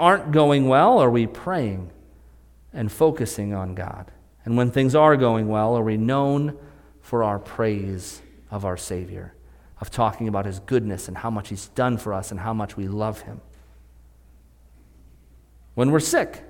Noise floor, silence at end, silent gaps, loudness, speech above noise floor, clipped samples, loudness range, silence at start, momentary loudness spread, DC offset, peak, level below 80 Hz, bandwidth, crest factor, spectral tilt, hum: -52 dBFS; 0 s; none; -22 LUFS; 30 dB; under 0.1%; 8 LU; 0 s; 19 LU; under 0.1%; -2 dBFS; -48 dBFS; 17.5 kHz; 20 dB; -6 dB/octave; none